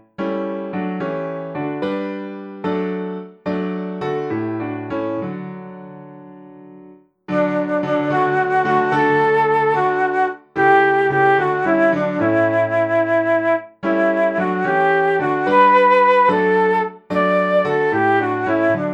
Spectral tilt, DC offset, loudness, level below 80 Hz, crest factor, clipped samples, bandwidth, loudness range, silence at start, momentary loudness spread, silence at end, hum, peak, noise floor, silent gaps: -7.5 dB/octave; under 0.1%; -18 LUFS; -62 dBFS; 14 dB; under 0.1%; 8.6 kHz; 10 LU; 0.2 s; 12 LU; 0 s; none; -4 dBFS; -45 dBFS; none